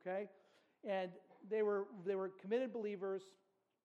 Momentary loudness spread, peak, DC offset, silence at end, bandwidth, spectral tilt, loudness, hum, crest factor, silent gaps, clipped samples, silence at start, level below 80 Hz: 11 LU; -28 dBFS; under 0.1%; 0.55 s; 8.4 kHz; -7 dB/octave; -43 LUFS; none; 16 dB; none; under 0.1%; 0.05 s; under -90 dBFS